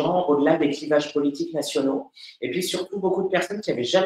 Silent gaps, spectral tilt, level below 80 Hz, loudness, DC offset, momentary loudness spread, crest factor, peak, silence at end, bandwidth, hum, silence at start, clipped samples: none; -4.5 dB/octave; -66 dBFS; -24 LUFS; under 0.1%; 8 LU; 18 dB; -6 dBFS; 0 s; 16 kHz; none; 0 s; under 0.1%